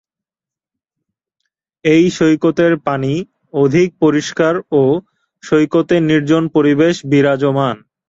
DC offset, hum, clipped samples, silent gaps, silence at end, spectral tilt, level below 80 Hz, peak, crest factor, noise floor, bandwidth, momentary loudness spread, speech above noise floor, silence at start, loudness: under 0.1%; none; under 0.1%; none; 0.35 s; -6.5 dB/octave; -54 dBFS; -2 dBFS; 14 dB; -89 dBFS; 7.8 kHz; 6 LU; 76 dB; 1.85 s; -14 LUFS